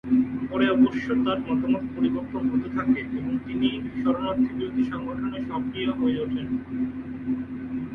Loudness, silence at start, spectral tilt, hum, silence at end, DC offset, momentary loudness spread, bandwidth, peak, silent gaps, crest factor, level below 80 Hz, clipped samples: -26 LUFS; 0.05 s; -8 dB/octave; none; 0 s; under 0.1%; 8 LU; 3.9 kHz; -10 dBFS; none; 16 dB; -50 dBFS; under 0.1%